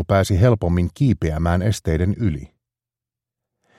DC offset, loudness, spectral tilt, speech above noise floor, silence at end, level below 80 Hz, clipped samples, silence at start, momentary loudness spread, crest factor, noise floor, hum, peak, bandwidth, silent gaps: under 0.1%; -19 LUFS; -7.5 dB/octave; 70 dB; 1.35 s; -34 dBFS; under 0.1%; 0 s; 6 LU; 18 dB; -89 dBFS; none; -2 dBFS; 13.5 kHz; none